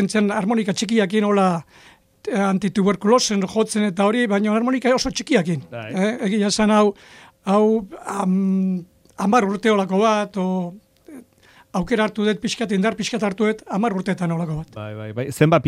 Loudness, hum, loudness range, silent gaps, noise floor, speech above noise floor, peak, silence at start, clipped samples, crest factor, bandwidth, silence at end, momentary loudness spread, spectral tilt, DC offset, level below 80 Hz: -20 LUFS; none; 3 LU; none; -52 dBFS; 33 dB; -2 dBFS; 0 s; under 0.1%; 18 dB; 13.5 kHz; 0 s; 11 LU; -5.5 dB/octave; under 0.1%; -52 dBFS